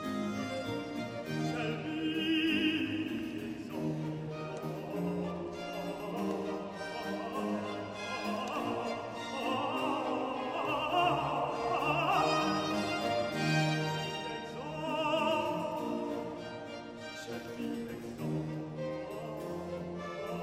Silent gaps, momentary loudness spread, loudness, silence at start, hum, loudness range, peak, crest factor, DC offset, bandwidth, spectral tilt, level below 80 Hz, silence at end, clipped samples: none; 11 LU; -35 LUFS; 0 s; none; 8 LU; -18 dBFS; 18 dB; under 0.1%; 16 kHz; -5.5 dB/octave; -64 dBFS; 0 s; under 0.1%